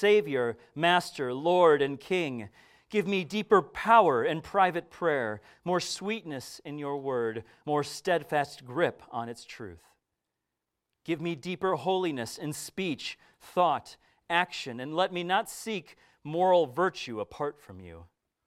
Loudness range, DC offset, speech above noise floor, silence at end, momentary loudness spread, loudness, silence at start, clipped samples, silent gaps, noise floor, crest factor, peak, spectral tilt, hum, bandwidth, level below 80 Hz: 8 LU; under 0.1%; 57 dB; 0.4 s; 16 LU; -29 LUFS; 0 s; under 0.1%; none; -86 dBFS; 22 dB; -8 dBFS; -4.5 dB/octave; none; 15.5 kHz; -68 dBFS